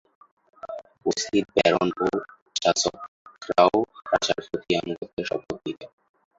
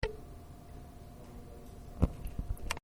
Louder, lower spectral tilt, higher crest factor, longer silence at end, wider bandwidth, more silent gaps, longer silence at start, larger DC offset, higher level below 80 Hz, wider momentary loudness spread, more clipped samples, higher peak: first, -25 LUFS vs -42 LUFS; second, -3.5 dB/octave vs -6 dB/octave; about the same, 24 dB vs 28 dB; first, 0.5 s vs 0.05 s; second, 8 kHz vs over 20 kHz; first, 2.42-2.46 s, 3.08-3.25 s, 5.13-5.17 s vs none; first, 0.65 s vs 0 s; neither; second, -60 dBFS vs -42 dBFS; about the same, 18 LU vs 17 LU; neither; first, -2 dBFS vs -10 dBFS